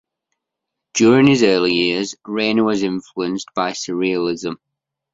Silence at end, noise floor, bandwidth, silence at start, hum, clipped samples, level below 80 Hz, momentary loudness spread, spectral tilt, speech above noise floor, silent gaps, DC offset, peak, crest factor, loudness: 0.6 s; -81 dBFS; 7.8 kHz; 0.95 s; none; under 0.1%; -58 dBFS; 12 LU; -4.5 dB/octave; 64 dB; none; under 0.1%; 0 dBFS; 18 dB; -17 LUFS